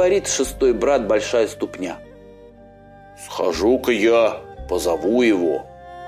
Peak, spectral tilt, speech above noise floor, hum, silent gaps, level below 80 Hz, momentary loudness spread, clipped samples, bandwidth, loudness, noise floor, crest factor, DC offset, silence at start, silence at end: -6 dBFS; -4 dB/octave; 26 dB; 50 Hz at -60 dBFS; none; -42 dBFS; 14 LU; under 0.1%; 15.5 kHz; -19 LUFS; -45 dBFS; 14 dB; under 0.1%; 0 s; 0 s